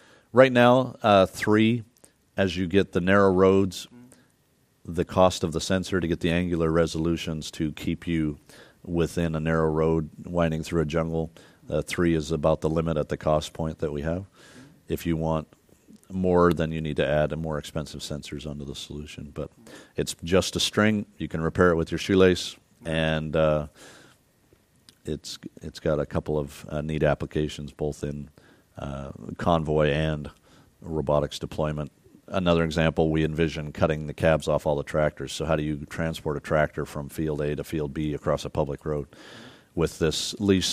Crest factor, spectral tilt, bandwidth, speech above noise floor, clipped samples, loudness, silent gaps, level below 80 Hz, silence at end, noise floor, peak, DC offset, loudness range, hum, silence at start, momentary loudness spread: 22 dB; -6 dB/octave; 15.5 kHz; 40 dB; under 0.1%; -25 LUFS; none; -44 dBFS; 0 s; -65 dBFS; -2 dBFS; under 0.1%; 6 LU; none; 0.35 s; 15 LU